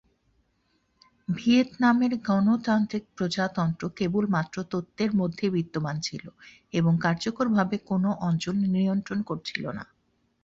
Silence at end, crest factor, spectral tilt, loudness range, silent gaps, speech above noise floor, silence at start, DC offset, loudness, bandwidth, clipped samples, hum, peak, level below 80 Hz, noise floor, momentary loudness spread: 0.6 s; 18 dB; -6.5 dB/octave; 3 LU; none; 45 dB; 1.3 s; under 0.1%; -26 LUFS; 7.8 kHz; under 0.1%; none; -10 dBFS; -62 dBFS; -71 dBFS; 10 LU